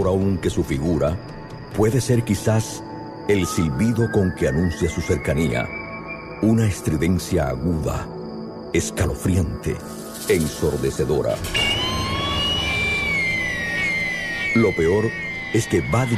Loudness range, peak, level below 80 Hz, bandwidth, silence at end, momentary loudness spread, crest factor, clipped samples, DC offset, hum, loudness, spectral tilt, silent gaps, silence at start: 3 LU; -6 dBFS; -36 dBFS; 14.5 kHz; 0 s; 11 LU; 16 dB; under 0.1%; under 0.1%; none; -21 LUFS; -5 dB/octave; none; 0 s